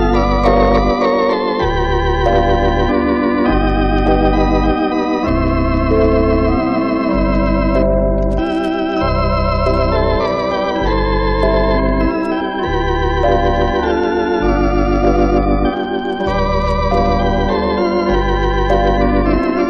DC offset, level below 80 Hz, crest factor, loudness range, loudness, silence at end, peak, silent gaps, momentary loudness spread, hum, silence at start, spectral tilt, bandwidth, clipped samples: under 0.1%; -20 dBFS; 14 dB; 1 LU; -15 LUFS; 0 s; 0 dBFS; none; 3 LU; none; 0 s; -8 dB/octave; 6.4 kHz; under 0.1%